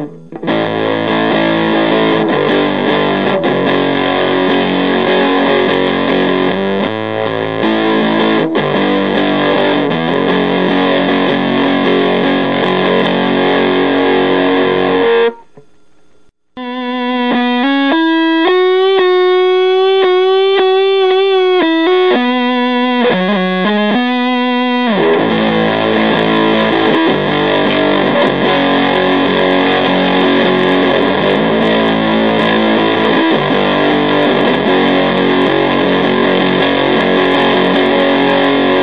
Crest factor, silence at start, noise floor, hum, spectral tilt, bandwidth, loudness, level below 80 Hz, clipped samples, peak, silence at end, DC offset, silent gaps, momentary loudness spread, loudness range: 12 dB; 0 s; -53 dBFS; none; -7.5 dB/octave; 6.4 kHz; -11 LUFS; -58 dBFS; under 0.1%; 0 dBFS; 0 s; 0.9%; none; 3 LU; 3 LU